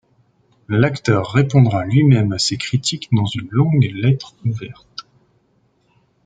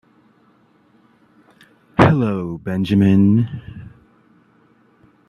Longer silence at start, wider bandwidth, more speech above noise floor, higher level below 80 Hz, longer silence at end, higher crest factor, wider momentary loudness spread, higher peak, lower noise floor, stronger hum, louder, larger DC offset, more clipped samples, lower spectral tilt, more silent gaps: second, 0.7 s vs 2 s; first, 9.2 kHz vs 6.8 kHz; first, 45 dB vs 40 dB; about the same, -52 dBFS vs -48 dBFS; second, 1.25 s vs 1.45 s; about the same, 16 dB vs 20 dB; second, 13 LU vs 20 LU; about the same, -2 dBFS vs 0 dBFS; first, -61 dBFS vs -56 dBFS; neither; about the same, -17 LUFS vs -17 LUFS; neither; neither; second, -6 dB/octave vs -9 dB/octave; neither